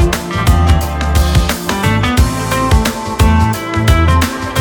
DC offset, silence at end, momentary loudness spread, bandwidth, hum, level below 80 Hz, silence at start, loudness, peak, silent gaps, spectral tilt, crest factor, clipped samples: under 0.1%; 0 s; 4 LU; 20 kHz; none; -16 dBFS; 0 s; -13 LUFS; 0 dBFS; none; -5.5 dB/octave; 12 dB; under 0.1%